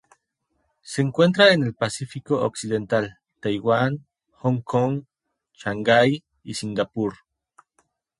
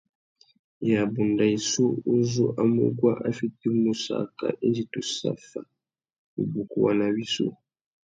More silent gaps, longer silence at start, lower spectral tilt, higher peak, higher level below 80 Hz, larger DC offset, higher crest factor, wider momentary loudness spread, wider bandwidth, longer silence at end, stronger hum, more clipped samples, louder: second, none vs 6.18-6.37 s; about the same, 0.85 s vs 0.8 s; about the same, -5.5 dB/octave vs -5.5 dB/octave; first, -2 dBFS vs -8 dBFS; first, -60 dBFS vs -66 dBFS; neither; about the same, 22 dB vs 18 dB; first, 15 LU vs 8 LU; first, 11.5 kHz vs 9.2 kHz; first, 1.05 s vs 0.65 s; neither; neither; first, -22 LUFS vs -25 LUFS